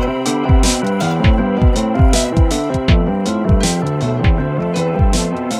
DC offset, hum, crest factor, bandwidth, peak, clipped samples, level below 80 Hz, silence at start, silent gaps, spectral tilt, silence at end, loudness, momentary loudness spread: under 0.1%; none; 14 dB; 13.5 kHz; 0 dBFS; under 0.1%; -18 dBFS; 0 s; none; -5.5 dB/octave; 0 s; -15 LUFS; 4 LU